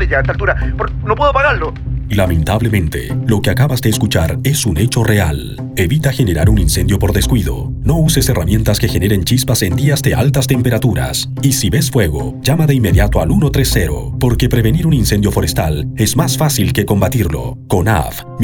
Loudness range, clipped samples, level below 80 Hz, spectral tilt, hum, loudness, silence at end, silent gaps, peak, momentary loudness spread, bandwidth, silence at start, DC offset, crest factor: 1 LU; under 0.1%; -22 dBFS; -5.5 dB/octave; none; -14 LUFS; 0 s; none; 0 dBFS; 6 LU; 20 kHz; 0 s; under 0.1%; 12 dB